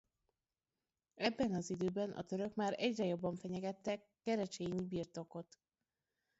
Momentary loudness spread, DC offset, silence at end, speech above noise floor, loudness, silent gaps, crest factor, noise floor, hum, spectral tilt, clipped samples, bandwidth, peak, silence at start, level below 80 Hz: 8 LU; under 0.1%; 0.95 s; over 50 dB; -41 LUFS; none; 20 dB; under -90 dBFS; none; -5 dB/octave; under 0.1%; 7.6 kHz; -22 dBFS; 1.15 s; -72 dBFS